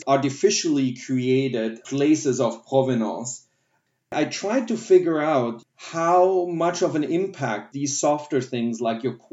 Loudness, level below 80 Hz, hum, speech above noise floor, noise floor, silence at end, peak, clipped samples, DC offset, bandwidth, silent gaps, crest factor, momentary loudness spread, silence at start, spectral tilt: -23 LUFS; -80 dBFS; none; 49 dB; -71 dBFS; 0.15 s; -6 dBFS; under 0.1%; under 0.1%; 8 kHz; none; 18 dB; 10 LU; 0 s; -5 dB/octave